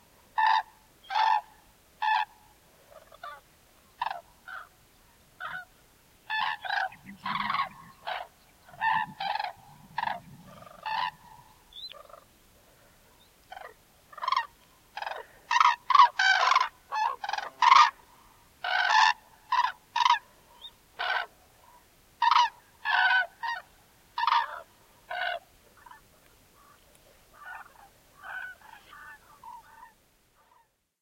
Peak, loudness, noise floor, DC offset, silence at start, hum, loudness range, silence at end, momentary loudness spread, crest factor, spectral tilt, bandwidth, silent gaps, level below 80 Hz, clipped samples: -6 dBFS; -27 LUFS; -66 dBFS; under 0.1%; 0.35 s; none; 22 LU; 1.15 s; 26 LU; 26 dB; -0.5 dB/octave; 16.5 kHz; none; -68 dBFS; under 0.1%